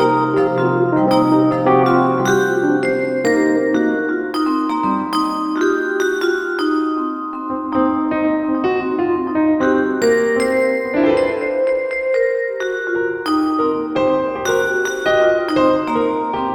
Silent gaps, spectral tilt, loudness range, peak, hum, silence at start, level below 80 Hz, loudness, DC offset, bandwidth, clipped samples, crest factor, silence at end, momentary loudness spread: none; -5.5 dB/octave; 3 LU; -2 dBFS; none; 0 s; -52 dBFS; -17 LUFS; under 0.1%; 17 kHz; under 0.1%; 14 dB; 0 s; 5 LU